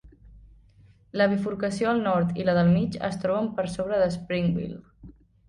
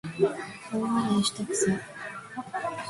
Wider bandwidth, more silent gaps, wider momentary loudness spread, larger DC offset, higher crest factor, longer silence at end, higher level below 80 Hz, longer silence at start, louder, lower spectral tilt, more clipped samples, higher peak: about the same, 11 kHz vs 11.5 kHz; neither; second, 7 LU vs 13 LU; neither; about the same, 16 dB vs 18 dB; first, 0.35 s vs 0 s; first, -52 dBFS vs -64 dBFS; about the same, 0.05 s vs 0.05 s; first, -25 LUFS vs -29 LUFS; first, -7.5 dB/octave vs -4.5 dB/octave; neither; about the same, -12 dBFS vs -12 dBFS